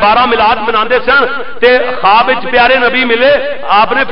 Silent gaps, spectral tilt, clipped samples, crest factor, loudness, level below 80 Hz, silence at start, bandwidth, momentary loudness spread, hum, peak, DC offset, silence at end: none; -6.5 dB/octave; under 0.1%; 10 dB; -9 LUFS; -36 dBFS; 0 s; 5.6 kHz; 4 LU; none; 0 dBFS; 8%; 0 s